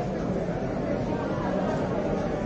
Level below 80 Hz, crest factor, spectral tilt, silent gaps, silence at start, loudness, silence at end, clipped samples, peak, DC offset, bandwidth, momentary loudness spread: -42 dBFS; 12 dB; -8 dB/octave; none; 0 s; -28 LUFS; 0 s; under 0.1%; -16 dBFS; under 0.1%; 8.2 kHz; 2 LU